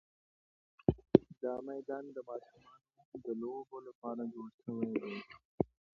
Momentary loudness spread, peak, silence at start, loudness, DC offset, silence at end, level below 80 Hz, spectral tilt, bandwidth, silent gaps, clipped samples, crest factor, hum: 18 LU; -6 dBFS; 0.9 s; -38 LUFS; under 0.1%; 0.3 s; -62 dBFS; -8 dB/octave; 6 kHz; 3.05-3.12 s, 3.95-4.02 s, 4.54-4.58 s, 5.45-5.58 s; under 0.1%; 32 dB; none